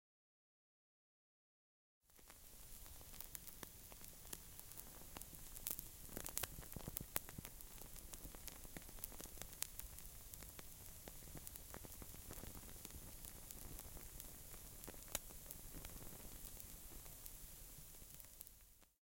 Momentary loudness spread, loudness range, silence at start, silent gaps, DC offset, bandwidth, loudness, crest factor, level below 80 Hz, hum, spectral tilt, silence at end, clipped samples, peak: 10 LU; 7 LU; 2.05 s; none; under 0.1%; 17 kHz; -53 LUFS; 42 dB; -62 dBFS; none; -2.5 dB/octave; 0.1 s; under 0.1%; -14 dBFS